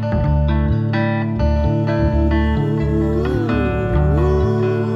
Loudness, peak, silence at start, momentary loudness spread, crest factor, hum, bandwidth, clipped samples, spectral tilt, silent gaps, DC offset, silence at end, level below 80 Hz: -18 LUFS; -4 dBFS; 0 s; 2 LU; 12 dB; none; 6.2 kHz; under 0.1%; -9.5 dB/octave; none; under 0.1%; 0 s; -22 dBFS